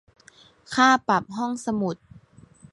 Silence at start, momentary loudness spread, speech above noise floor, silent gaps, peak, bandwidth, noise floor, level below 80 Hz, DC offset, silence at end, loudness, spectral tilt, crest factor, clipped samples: 0.7 s; 12 LU; 32 dB; none; -6 dBFS; 11.5 kHz; -54 dBFS; -62 dBFS; under 0.1%; 0.8 s; -23 LUFS; -4 dB/octave; 20 dB; under 0.1%